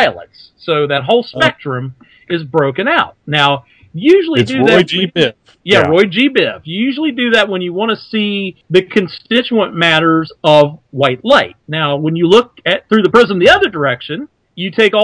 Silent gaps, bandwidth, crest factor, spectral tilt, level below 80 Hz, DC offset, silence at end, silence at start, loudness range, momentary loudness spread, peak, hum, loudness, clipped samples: none; 11 kHz; 12 dB; -5.5 dB/octave; -50 dBFS; under 0.1%; 0 s; 0 s; 3 LU; 11 LU; 0 dBFS; none; -12 LUFS; 0.6%